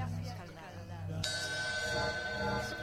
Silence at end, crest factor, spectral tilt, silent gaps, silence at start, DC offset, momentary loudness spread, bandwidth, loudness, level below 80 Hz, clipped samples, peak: 0 s; 20 dB; -3.5 dB/octave; none; 0 s; under 0.1%; 12 LU; 16 kHz; -36 LUFS; -54 dBFS; under 0.1%; -18 dBFS